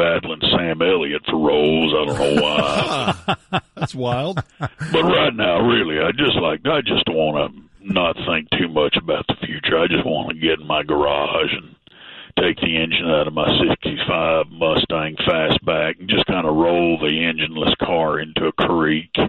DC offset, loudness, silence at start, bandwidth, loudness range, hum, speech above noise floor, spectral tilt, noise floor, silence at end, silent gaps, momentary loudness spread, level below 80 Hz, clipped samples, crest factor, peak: under 0.1%; -18 LUFS; 0 s; 11.5 kHz; 2 LU; none; 22 dB; -6 dB/octave; -41 dBFS; 0 s; none; 6 LU; -44 dBFS; under 0.1%; 14 dB; -4 dBFS